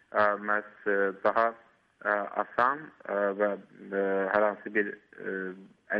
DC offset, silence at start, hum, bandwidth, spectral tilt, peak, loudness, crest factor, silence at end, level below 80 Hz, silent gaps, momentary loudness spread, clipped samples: under 0.1%; 0.15 s; none; 5.6 kHz; -8 dB/octave; -10 dBFS; -29 LUFS; 20 dB; 0 s; -74 dBFS; none; 10 LU; under 0.1%